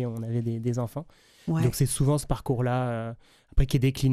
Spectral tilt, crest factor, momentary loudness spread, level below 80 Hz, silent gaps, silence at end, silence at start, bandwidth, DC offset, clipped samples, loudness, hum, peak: -6.5 dB/octave; 16 dB; 12 LU; -36 dBFS; none; 0 s; 0 s; 15.5 kHz; under 0.1%; under 0.1%; -27 LUFS; none; -10 dBFS